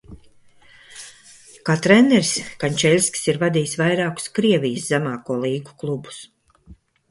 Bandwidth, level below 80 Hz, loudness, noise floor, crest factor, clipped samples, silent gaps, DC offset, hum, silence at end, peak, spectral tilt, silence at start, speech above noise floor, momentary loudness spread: 11.5 kHz; -56 dBFS; -19 LUFS; -50 dBFS; 20 dB; under 0.1%; none; under 0.1%; none; 0.35 s; 0 dBFS; -4.5 dB/octave; 0.1 s; 31 dB; 21 LU